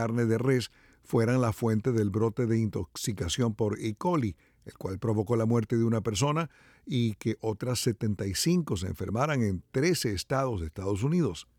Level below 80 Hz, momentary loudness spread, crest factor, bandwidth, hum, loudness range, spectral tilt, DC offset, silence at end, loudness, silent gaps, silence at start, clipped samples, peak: -54 dBFS; 7 LU; 14 dB; 17 kHz; none; 2 LU; -6 dB/octave; under 0.1%; 0.15 s; -29 LUFS; none; 0 s; under 0.1%; -14 dBFS